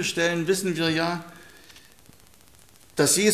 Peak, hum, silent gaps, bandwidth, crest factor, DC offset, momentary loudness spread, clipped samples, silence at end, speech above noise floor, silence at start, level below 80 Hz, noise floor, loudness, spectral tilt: -8 dBFS; none; none; 16 kHz; 18 dB; 0.2%; 14 LU; under 0.1%; 0 s; 31 dB; 0 s; -62 dBFS; -55 dBFS; -24 LUFS; -3 dB/octave